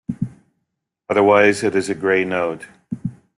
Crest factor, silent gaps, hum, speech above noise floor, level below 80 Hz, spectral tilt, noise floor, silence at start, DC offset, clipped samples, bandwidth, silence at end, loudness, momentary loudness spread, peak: 18 dB; none; none; 59 dB; -56 dBFS; -5.5 dB/octave; -76 dBFS; 0.1 s; under 0.1%; under 0.1%; 12 kHz; 0.25 s; -18 LUFS; 16 LU; -2 dBFS